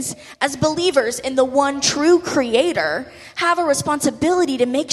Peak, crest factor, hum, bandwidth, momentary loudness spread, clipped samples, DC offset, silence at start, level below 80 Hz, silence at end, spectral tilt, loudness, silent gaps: -2 dBFS; 16 dB; none; 14 kHz; 7 LU; under 0.1%; under 0.1%; 0 s; -52 dBFS; 0 s; -3.5 dB/octave; -18 LUFS; none